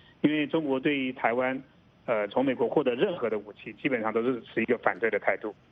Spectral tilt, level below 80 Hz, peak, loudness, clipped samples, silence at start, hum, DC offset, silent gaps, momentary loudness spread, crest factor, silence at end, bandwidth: -8.5 dB/octave; -70 dBFS; -10 dBFS; -28 LUFS; under 0.1%; 0.25 s; none; under 0.1%; none; 7 LU; 18 dB; 0.2 s; 4.9 kHz